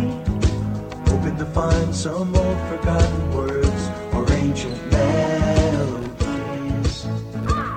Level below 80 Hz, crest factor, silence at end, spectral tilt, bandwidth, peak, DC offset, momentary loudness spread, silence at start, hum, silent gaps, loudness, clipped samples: -28 dBFS; 16 dB; 0 s; -6.5 dB/octave; 9.6 kHz; -4 dBFS; under 0.1%; 7 LU; 0 s; none; none; -22 LUFS; under 0.1%